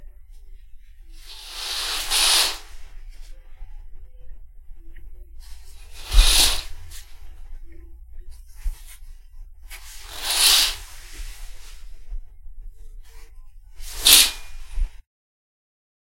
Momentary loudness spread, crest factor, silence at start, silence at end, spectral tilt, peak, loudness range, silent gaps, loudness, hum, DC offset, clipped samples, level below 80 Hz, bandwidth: 29 LU; 24 dB; 0 s; 1.1 s; 0.5 dB/octave; 0 dBFS; 15 LU; none; -17 LUFS; none; under 0.1%; under 0.1%; -30 dBFS; 16.5 kHz